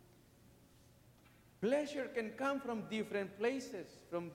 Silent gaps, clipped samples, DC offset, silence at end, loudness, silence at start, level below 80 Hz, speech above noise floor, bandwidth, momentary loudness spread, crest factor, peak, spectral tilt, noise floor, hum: none; under 0.1%; under 0.1%; 0 s; -40 LUFS; 1.05 s; -76 dBFS; 26 dB; 16.5 kHz; 8 LU; 18 dB; -24 dBFS; -5.5 dB/octave; -65 dBFS; none